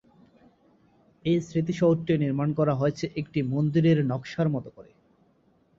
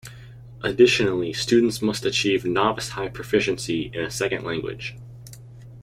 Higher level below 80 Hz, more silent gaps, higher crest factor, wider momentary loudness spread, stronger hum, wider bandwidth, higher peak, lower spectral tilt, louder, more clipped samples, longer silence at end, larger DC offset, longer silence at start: second, -60 dBFS vs -50 dBFS; neither; about the same, 16 dB vs 20 dB; second, 8 LU vs 24 LU; neither; second, 7.4 kHz vs 16 kHz; second, -10 dBFS vs -4 dBFS; first, -8 dB/octave vs -4.5 dB/octave; second, -26 LUFS vs -22 LUFS; neither; first, 0.95 s vs 0 s; neither; first, 1.25 s vs 0.05 s